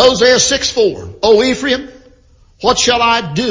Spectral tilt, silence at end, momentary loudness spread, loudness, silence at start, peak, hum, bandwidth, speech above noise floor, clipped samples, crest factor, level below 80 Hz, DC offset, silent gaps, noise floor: -2.5 dB/octave; 0 s; 8 LU; -12 LUFS; 0 s; 0 dBFS; none; 7.6 kHz; 35 dB; under 0.1%; 12 dB; -40 dBFS; under 0.1%; none; -47 dBFS